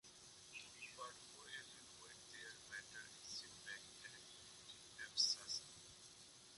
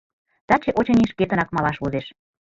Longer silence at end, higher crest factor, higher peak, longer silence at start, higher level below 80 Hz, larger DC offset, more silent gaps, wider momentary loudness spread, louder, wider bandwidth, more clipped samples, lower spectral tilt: second, 0 s vs 0.45 s; first, 26 dB vs 20 dB; second, -26 dBFS vs -2 dBFS; second, 0.05 s vs 0.5 s; second, -82 dBFS vs -48 dBFS; neither; neither; first, 19 LU vs 9 LU; second, -49 LUFS vs -21 LUFS; first, 11.5 kHz vs 7.4 kHz; neither; second, 0.5 dB/octave vs -7.5 dB/octave